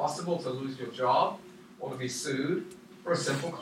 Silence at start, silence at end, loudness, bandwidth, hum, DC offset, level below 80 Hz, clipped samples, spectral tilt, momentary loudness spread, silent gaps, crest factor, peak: 0 s; 0 s; -31 LUFS; 16.5 kHz; none; under 0.1%; -74 dBFS; under 0.1%; -4.5 dB/octave; 15 LU; none; 20 dB; -12 dBFS